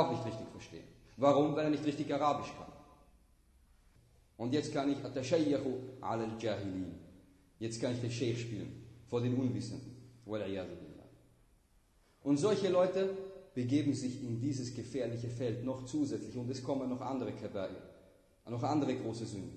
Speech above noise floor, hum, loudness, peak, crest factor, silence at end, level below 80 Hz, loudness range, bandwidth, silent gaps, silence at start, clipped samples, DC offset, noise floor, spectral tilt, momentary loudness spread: 33 dB; none; -36 LUFS; -14 dBFS; 22 dB; 0 s; -68 dBFS; 5 LU; 12 kHz; none; 0 s; under 0.1%; under 0.1%; -68 dBFS; -6.5 dB/octave; 16 LU